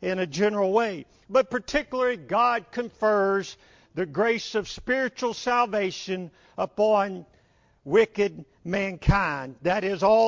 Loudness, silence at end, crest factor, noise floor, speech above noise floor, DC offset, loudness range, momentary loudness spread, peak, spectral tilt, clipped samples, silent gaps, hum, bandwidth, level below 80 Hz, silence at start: -25 LUFS; 0 s; 18 dB; -62 dBFS; 38 dB; under 0.1%; 2 LU; 10 LU; -8 dBFS; -5.5 dB/octave; under 0.1%; none; none; 7.6 kHz; -44 dBFS; 0 s